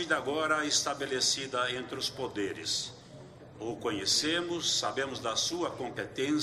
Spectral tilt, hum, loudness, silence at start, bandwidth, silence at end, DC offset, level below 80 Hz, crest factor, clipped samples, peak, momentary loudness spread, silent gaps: -2 dB/octave; none; -31 LUFS; 0 s; 14 kHz; 0 s; under 0.1%; -66 dBFS; 18 dB; under 0.1%; -14 dBFS; 13 LU; none